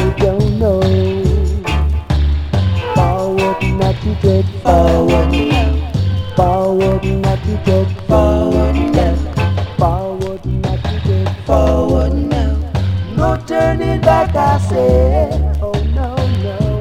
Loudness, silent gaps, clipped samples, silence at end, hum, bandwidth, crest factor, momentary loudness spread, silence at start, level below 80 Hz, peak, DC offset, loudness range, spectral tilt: -15 LUFS; none; under 0.1%; 0 s; none; 11.5 kHz; 14 dB; 5 LU; 0 s; -20 dBFS; 0 dBFS; under 0.1%; 2 LU; -7.5 dB/octave